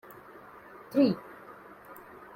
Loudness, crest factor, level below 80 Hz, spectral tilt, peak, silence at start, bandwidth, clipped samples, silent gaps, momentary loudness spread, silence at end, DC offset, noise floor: -28 LUFS; 20 dB; -72 dBFS; -7.5 dB/octave; -12 dBFS; 0.9 s; 16.5 kHz; under 0.1%; none; 23 LU; 0.45 s; under 0.1%; -51 dBFS